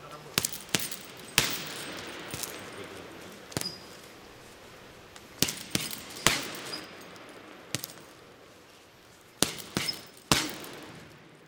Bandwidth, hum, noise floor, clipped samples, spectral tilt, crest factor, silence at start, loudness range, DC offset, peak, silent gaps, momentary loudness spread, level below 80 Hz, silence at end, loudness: 19 kHz; none; -55 dBFS; under 0.1%; -2 dB/octave; 36 dB; 0 s; 7 LU; under 0.1%; 0 dBFS; none; 22 LU; -58 dBFS; 0 s; -31 LUFS